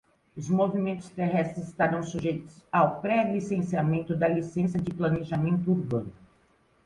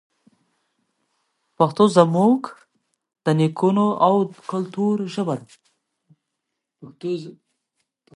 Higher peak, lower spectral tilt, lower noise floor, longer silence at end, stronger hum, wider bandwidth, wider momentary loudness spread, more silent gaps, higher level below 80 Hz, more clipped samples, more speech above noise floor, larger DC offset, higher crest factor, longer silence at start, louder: second, -8 dBFS vs 0 dBFS; about the same, -8 dB/octave vs -7.5 dB/octave; second, -65 dBFS vs -80 dBFS; about the same, 0.75 s vs 0.85 s; neither; about the same, 10.5 kHz vs 11.5 kHz; second, 7 LU vs 14 LU; neither; first, -58 dBFS vs -70 dBFS; neither; second, 38 dB vs 61 dB; neither; about the same, 18 dB vs 22 dB; second, 0.35 s vs 1.6 s; second, -28 LUFS vs -20 LUFS